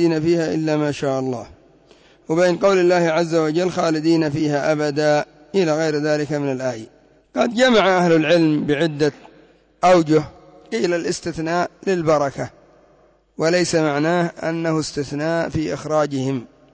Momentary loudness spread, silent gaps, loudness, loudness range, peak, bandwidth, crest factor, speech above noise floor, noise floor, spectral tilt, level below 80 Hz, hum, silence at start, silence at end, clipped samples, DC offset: 9 LU; none; -19 LUFS; 4 LU; -6 dBFS; 8 kHz; 14 dB; 37 dB; -55 dBFS; -5.5 dB/octave; -52 dBFS; none; 0 s; 0.25 s; under 0.1%; under 0.1%